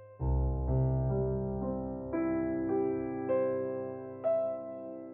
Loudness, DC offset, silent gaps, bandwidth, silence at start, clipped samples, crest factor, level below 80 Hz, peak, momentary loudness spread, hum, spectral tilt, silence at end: -33 LUFS; under 0.1%; none; 2.8 kHz; 0 s; under 0.1%; 12 dB; -40 dBFS; -20 dBFS; 7 LU; none; -12 dB/octave; 0 s